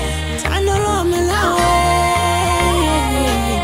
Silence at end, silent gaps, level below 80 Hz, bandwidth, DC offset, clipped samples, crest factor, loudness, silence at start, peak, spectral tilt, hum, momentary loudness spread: 0 s; none; -24 dBFS; 16 kHz; under 0.1%; under 0.1%; 14 dB; -16 LUFS; 0 s; 0 dBFS; -4.5 dB/octave; none; 4 LU